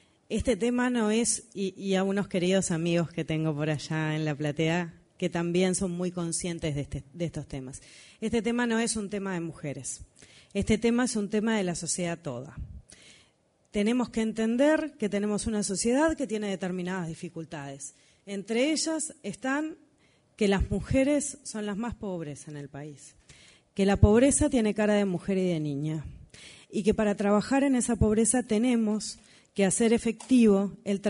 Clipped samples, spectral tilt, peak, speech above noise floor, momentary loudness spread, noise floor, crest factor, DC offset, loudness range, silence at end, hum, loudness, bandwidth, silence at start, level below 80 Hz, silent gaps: under 0.1%; -5 dB/octave; -6 dBFS; 39 dB; 15 LU; -67 dBFS; 22 dB; under 0.1%; 6 LU; 0 s; none; -28 LUFS; 11 kHz; 0.3 s; -46 dBFS; none